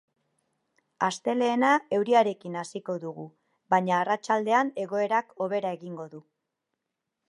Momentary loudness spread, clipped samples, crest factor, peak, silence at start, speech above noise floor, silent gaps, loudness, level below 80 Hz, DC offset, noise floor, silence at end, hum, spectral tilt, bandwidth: 16 LU; under 0.1%; 20 dB; -8 dBFS; 1 s; 58 dB; none; -26 LUFS; -82 dBFS; under 0.1%; -84 dBFS; 1.1 s; none; -5 dB/octave; 11.5 kHz